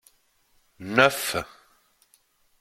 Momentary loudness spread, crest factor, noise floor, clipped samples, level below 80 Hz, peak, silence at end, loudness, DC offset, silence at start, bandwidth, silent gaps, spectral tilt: 22 LU; 28 dB; -65 dBFS; under 0.1%; -60 dBFS; -2 dBFS; 1.15 s; -23 LUFS; under 0.1%; 0.8 s; 16.5 kHz; none; -3 dB/octave